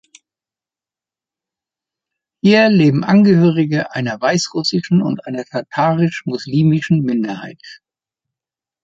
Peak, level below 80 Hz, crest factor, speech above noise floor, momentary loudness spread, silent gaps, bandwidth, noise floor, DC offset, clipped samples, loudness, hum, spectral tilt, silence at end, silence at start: -2 dBFS; -58 dBFS; 16 dB; over 75 dB; 13 LU; none; 7.8 kHz; under -90 dBFS; under 0.1%; under 0.1%; -15 LUFS; none; -6.5 dB/octave; 1.1 s; 2.45 s